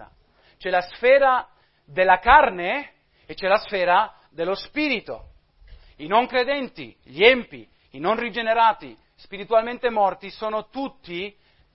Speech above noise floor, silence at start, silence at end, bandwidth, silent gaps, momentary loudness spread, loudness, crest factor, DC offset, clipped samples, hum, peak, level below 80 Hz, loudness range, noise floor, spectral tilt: 37 dB; 0 s; 0.45 s; 5.8 kHz; none; 19 LU; -21 LUFS; 22 dB; under 0.1%; under 0.1%; none; 0 dBFS; -48 dBFS; 5 LU; -58 dBFS; -8 dB/octave